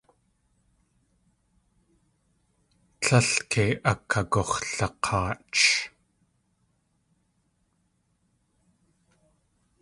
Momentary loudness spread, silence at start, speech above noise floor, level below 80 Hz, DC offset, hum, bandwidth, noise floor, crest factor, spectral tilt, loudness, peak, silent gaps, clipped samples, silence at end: 8 LU; 3 s; 46 dB; -52 dBFS; under 0.1%; none; 11.5 kHz; -72 dBFS; 24 dB; -3.5 dB/octave; -24 LUFS; -6 dBFS; none; under 0.1%; 3.95 s